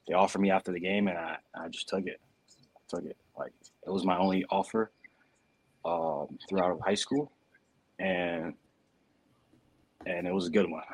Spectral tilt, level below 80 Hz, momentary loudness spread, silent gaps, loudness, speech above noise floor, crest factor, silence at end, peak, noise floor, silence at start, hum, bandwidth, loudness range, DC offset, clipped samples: -5.5 dB/octave; -70 dBFS; 14 LU; none; -32 LUFS; 39 dB; 22 dB; 0 s; -10 dBFS; -71 dBFS; 0.05 s; none; 11 kHz; 5 LU; under 0.1%; under 0.1%